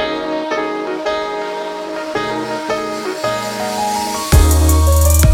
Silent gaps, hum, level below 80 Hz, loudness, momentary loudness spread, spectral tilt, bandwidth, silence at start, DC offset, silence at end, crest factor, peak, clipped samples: none; none; -20 dBFS; -17 LUFS; 10 LU; -5 dB/octave; 16.5 kHz; 0 s; under 0.1%; 0 s; 14 dB; 0 dBFS; under 0.1%